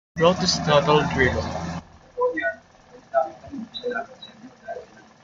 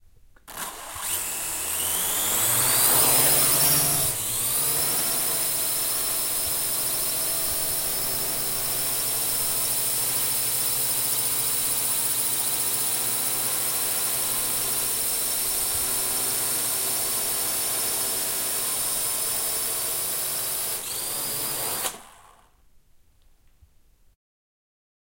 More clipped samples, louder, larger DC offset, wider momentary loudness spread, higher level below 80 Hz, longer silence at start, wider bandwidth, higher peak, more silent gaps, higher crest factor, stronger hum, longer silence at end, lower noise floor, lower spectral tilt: neither; about the same, -23 LUFS vs -22 LUFS; neither; first, 21 LU vs 8 LU; first, -48 dBFS vs -54 dBFS; second, 0.15 s vs 0.45 s; second, 7.6 kHz vs 16.5 kHz; first, -2 dBFS vs -6 dBFS; neither; about the same, 22 dB vs 20 dB; neither; second, 0.4 s vs 3.05 s; second, -50 dBFS vs -57 dBFS; first, -4.5 dB/octave vs -0.5 dB/octave